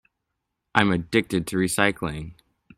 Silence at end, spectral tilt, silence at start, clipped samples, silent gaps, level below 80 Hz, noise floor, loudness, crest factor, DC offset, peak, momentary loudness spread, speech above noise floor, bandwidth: 0.45 s; -4.5 dB/octave; 0.75 s; under 0.1%; none; -50 dBFS; -80 dBFS; -23 LUFS; 26 dB; under 0.1%; 0 dBFS; 11 LU; 57 dB; 16 kHz